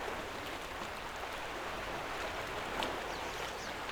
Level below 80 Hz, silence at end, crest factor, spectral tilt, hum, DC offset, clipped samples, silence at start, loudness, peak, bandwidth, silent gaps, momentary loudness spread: -56 dBFS; 0 s; 22 dB; -3 dB/octave; none; under 0.1%; under 0.1%; 0 s; -40 LUFS; -18 dBFS; over 20 kHz; none; 4 LU